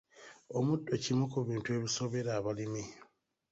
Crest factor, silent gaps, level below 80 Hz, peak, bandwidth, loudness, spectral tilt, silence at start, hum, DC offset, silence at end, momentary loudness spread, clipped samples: 16 dB; none; -68 dBFS; -20 dBFS; 8 kHz; -35 LUFS; -5.5 dB/octave; 0.15 s; none; under 0.1%; 0.5 s; 11 LU; under 0.1%